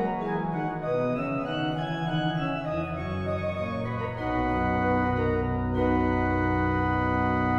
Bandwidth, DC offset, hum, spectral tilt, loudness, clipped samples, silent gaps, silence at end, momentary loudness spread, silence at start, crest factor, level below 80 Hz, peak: 7 kHz; under 0.1%; none; -8.5 dB/octave; -27 LUFS; under 0.1%; none; 0 s; 6 LU; 0 s; 14 dB; -42 dBFS; -12 dBFS